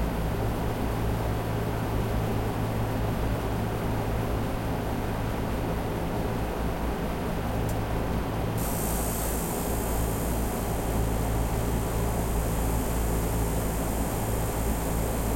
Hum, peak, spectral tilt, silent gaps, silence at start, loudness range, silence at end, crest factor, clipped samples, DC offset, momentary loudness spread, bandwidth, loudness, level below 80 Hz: none; -16 dBFS; -5.5 dB/octave; none; 0 s; 2 LU; 0 s; 12 dB; under 0.1%; under 0.1%; 2 LU; 16 kHz; -29 LUFS; -32 dBFS